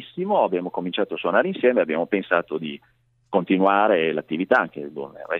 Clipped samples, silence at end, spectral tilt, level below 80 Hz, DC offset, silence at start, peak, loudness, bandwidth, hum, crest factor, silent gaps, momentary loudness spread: under 0.1%; 0 s; -8 dB/octave; -70 dBFS; under 0.1%; 0 s; -4 dBFS; -22 LUFS; 5.6 kHz; none; 18 dB; none; 13 LU